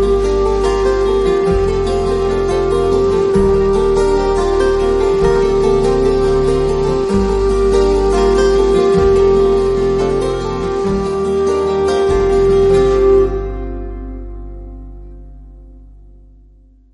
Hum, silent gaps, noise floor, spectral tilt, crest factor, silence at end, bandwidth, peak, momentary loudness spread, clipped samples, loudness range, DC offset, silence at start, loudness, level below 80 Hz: 50 Hz at -35 dBFS; none; -45 dBFS; -6.5 dB/octave; 12 dB; 1.05 s; 11 kHz; -2 dBFS; 9 LU; under 0.1%; 3 LU; under 0.1%; 0 s; -14 LUFS; -24 dBFS